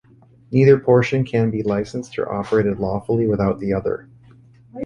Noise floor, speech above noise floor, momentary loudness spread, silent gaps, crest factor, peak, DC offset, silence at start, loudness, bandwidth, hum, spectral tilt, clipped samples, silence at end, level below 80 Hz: -48 dBFS; 30 dB; 11 LU; none; 18 dB; -2 dBFS; under 0.1%; 0.5 s; -19 LUFS; 9.6 kHz; none; -8.5 dB/octave; under 0.1%; 0 s; -46 dBFS